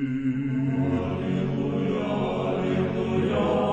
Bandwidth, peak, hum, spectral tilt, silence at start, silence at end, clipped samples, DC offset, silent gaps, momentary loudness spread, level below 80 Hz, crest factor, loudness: 8.2 kHz; -12 dBFS; none; -8.5 dB/octave; 0 s; 0 s; under 0.1%; under 0.1%; none; 3 LU; -50 dBFS; 12 dB; -26 LUFS